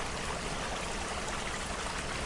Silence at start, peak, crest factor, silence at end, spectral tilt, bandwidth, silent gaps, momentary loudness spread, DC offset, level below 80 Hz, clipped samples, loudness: 0 s; -22 dBFS; 14 dB; 0 s; -3 dB/octave; 11.5 kHz; none; 0 LU; under 0.1%; -44 dBFS; under 0.1%; -36 LUFS